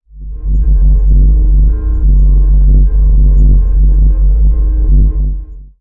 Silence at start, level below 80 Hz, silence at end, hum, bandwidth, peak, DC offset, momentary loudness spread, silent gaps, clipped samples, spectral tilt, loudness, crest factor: 0.15 s; -8 dBFS; 0.15 s; none; 1.1 kHz; -2 dBFS; under 0.1%; 7 LU; none; under 0.1%; -13 dB/octave; -11 LUFS; 4 dB